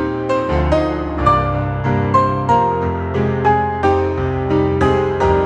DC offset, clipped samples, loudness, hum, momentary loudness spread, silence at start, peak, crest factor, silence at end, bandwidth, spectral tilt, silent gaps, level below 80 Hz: under 0.1%; under 0.1%; -16 LUFS; none; 4 LU; 0 s; 0 dBFS; 16 dB; 0 s; 9 kHz; -8 dB/octave; none; -30 dBFS